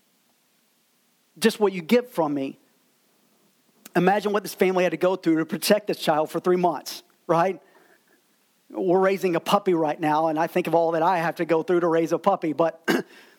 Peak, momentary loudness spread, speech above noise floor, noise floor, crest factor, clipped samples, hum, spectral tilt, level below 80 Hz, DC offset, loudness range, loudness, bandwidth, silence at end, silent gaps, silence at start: -4 dBFS; 5 LU; 43 dB; -66 dBFS; 20 dB; under 0.1%; none; -5.5 dB/octave; -78 dBFS; under 0.1%; 4 LU; -23 LUFS; 18.5 kHz; 0.35 s; none; 1.35 s